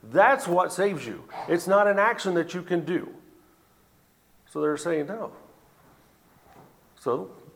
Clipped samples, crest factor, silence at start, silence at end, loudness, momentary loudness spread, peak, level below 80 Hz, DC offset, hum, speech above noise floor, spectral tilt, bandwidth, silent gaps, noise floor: under 0.1%; 22 dB; 0.05 s; 0.2 s; -25 LUFS; 17 LU; -6 dBFS; -72 dBFS; under 0.1%; none; 37 dB; -5 dB/octave; 18 kHz; none; -62 dBFS